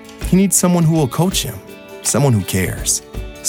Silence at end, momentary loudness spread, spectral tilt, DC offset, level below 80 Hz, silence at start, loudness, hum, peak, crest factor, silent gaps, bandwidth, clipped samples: 0 s; 13 LU; -4.5 dB/octave; under 0.1%; -34 dBFS; 0 s; -16 LUFS; none; -2 dBFS; 14 dB; none; 18.5 kHz; under 0.1%